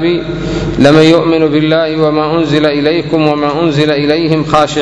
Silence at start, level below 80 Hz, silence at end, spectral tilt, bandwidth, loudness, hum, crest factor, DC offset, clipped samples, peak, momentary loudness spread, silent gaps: 0 s; -34 dBFS; 0 s; -6.5 dB/octave; 11 kHz; -10 LUFS; none; 10 dB; under 0.1%; 1%; 0 dBFS; 6 LU; none